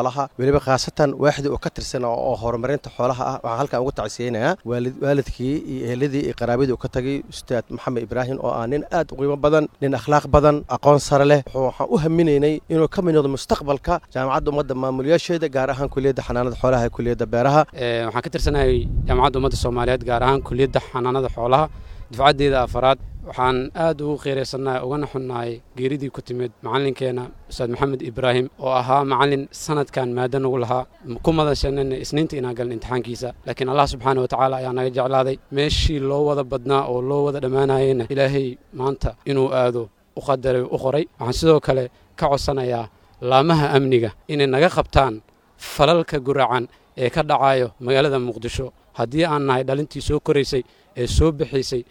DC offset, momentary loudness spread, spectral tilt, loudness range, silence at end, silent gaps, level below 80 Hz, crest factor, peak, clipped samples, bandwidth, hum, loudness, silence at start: under 0.1%; 9 LU; -6 dB/octave; 5 LU; 0.05 s; none; -34 dBFS; 20 dB; 0 dBFS; under 0.1%; 15.5 kHz; none; -21 LUFS; 0 s